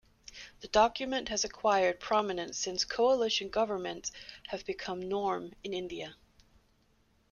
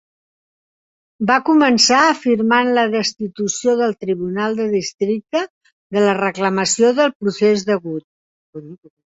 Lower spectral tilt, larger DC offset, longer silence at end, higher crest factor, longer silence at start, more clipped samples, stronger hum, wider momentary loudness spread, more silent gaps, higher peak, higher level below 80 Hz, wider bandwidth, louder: about the same, -2.5 dB/octave vs -3.5 dB/octave; neither; first, 1.15 s vs 0.35 s; first, 22 dB vs 16 dB; second, 0.3 s vs 1.2 s; neither; neither; first, 15 LU vs 11 LU; second, none vs 4.94-4.98 s, 5.50-5.61 s, 5.72-5.90 s, 7.15-7.20 s, 8.04-8.53 s; second, -12 dBFS vs -2 dBFS; about the same, -60 dBFS vs -62 dBFS; first, 11 kHz vs 8 kHz; second, -32 LUFS vs -16 LUFS